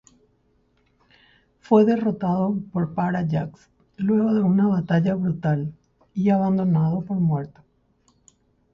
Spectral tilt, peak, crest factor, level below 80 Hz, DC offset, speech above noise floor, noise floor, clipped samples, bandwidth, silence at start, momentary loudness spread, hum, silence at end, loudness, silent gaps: -10 dB/octave; -6 dBFS; 18 dB; -58 dBFS; under 0.1%; 43 dB; -64 dBFS; under 0.1%; 7.2 kHz; 1.7 s; 9 LU; none; 1.25 s; -22 LUFS; none